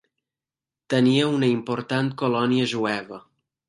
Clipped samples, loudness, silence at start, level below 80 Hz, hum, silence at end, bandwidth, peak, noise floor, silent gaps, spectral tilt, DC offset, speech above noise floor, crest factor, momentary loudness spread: under 0.1%; -23 LUFS; 0.9 s; -68 dBFS; none; 0.5 s; 11.5 kHz; -6 dBFS; under -90 dBFS; none; -6 dB/octave; under 0.1%; over 68 dB; 18 dB; 9 LU